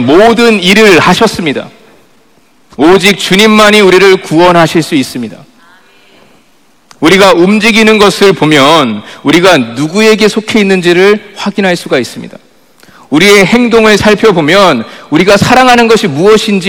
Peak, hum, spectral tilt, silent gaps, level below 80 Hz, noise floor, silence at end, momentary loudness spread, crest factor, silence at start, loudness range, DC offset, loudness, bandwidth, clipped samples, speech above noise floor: 0 dBFS; none; -4.5 dB/octave; none; -38 dBFS; -47 dBFS; 0 s; 9 LU; 6 dB; 0 s; 4 LU; 0.5%; -5 LUFS; over 20 kHz; 10%; 42 dB